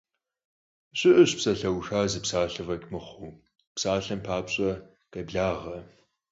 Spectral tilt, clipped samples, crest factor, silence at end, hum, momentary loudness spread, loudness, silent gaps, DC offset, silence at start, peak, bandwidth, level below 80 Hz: -4.5 dB/octave; under 0.1%; 20 dB; 0.45 s; none; 20 LU; -26 LUFS; 3.67-3.75 s; under 0.1%; 0.95 s; -6 dBFS; 8 kHz; -52 dBFS